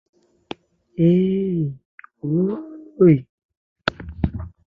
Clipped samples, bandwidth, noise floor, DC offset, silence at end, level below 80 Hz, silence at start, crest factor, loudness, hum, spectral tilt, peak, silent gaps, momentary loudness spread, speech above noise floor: under 0.1%; 6.4 kHz; -39 dBFS; under 0.1%; 0.2 s; -42 dBFS; 1 s; 20 dB; -21 LUFS; none; -9.5 dB/octave; -2 dBFS; 1.85-1.98 s, 3.29-3.38 s, 3.45-3.49 s, 3.57-3.76 s; 22 LU; 22 dB